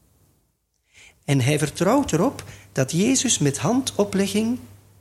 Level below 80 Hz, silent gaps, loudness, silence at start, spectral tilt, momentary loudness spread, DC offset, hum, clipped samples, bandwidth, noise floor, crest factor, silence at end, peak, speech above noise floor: -52 dBFS; none; -21 LUFS; 1.3 s; -4.5 dB/octave; 9 LU; under 0.1%; none; under 0.1%; 15.5 kHz; -69 dBFS; 18 dB; 0.35 s; -4 dBFS; 48 dB